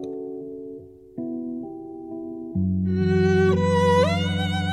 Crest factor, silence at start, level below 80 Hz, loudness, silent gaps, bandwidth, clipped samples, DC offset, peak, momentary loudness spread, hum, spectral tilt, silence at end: 16 dB; 0 s; -60 dBFS; -22 LUFS; none; 11 kHz; under 0.1%; under 0.1%; -8 dBFS; 18 LU; none; -7 dB/octave; 0 s